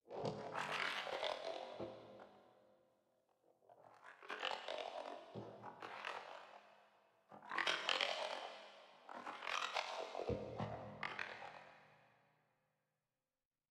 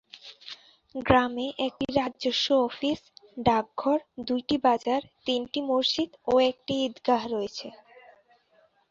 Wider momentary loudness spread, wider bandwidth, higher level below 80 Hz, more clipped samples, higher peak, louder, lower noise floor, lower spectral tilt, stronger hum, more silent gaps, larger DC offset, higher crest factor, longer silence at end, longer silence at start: first, 21 LU vs 18 LU; first, 14.5 kHz vs 7.6 kHz; second, -74 dBFS vs -56 dBFS; neither; second, -20 dBFS vs -4 dBFS; second, -45 LUFS vs -27 LUFS; first, under -90 dBFS vs -65 dBFS; second, -3 dB/octave vs -5 dB/octave; neither; neither; neither; about the same, 28 dB vs 24 dB; first, 1.65 s vs 1.2 s; about the same, 0.05 s vs 0.15 s